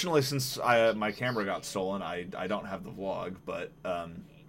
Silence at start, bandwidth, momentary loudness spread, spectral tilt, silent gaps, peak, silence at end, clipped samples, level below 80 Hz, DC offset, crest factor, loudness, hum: 0 s; 16.5 kHz; 13 LU; -4.5 dB/octave; none; -12 dBFS; 0 s; under 0.1%; -62 dBFS; under 0.1%; 20 dB; -32 LUFS; none